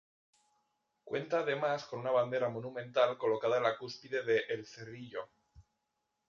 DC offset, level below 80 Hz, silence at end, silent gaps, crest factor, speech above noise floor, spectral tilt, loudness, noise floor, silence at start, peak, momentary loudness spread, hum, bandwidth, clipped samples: under 0.1%; -76 dBFS; 0.65 s; none; 20 dB; 50 dB; -3 dB/octave; -34 LUFS; -84 dBFS; 1.05 s; -16 dBFS; 14 LU; none; 7.2 kHz; under 0.1%